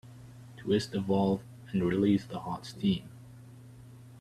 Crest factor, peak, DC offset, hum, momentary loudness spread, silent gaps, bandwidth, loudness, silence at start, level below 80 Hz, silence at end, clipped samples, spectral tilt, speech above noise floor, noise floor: 18 dB; -14 dBFS; under 0.1%; none; 24 LU; none; 13 kHz; -31 LUFS; 0.05 s; -62 dBFS; 0 s; under 0.1%; -7 dB/octave; 21 dB; -51 dBFS